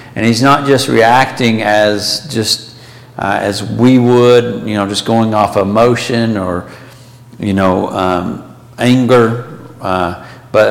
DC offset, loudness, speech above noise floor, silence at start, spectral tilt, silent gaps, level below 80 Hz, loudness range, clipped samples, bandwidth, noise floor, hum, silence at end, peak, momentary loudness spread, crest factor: under 0.1%; -12 LUFS; 25 dB; 0 s; -5.5 dB/octave; none; -46 dBFS; 3 LU; under 0.1%; 16.5 kHz; -36 dBFS; none; 0 s; 0 dBFS; 13 LU; 12 dB